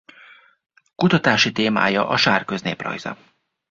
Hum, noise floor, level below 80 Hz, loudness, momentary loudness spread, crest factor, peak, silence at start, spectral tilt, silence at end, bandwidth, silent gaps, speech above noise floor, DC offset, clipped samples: none; -49 dBFS; -58 dBFS; -19 LUFS; 13 LU; 20 dB; -2 dBFS; 1 s; -4.5 dB/octave; 0.55 s; 7.6 kHz; none; 30 dB; under 0.1%; under 0.1%